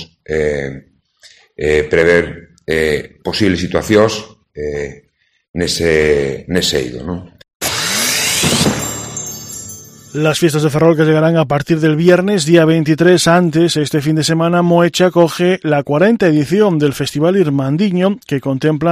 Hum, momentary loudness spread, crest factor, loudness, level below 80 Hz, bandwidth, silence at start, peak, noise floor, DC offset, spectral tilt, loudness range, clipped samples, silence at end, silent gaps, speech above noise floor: none; 13 LU; 14 dB; -13 LUFS; -40 dBFS; 15.5 kHz; 0 s; 0 dBFS; -46 dBFS; under 0.1%; -5 dB/octave; 5 LU; under 0.1%; 0 s; 5.49-5.54 s, 7.55-7.60 s; 34 dB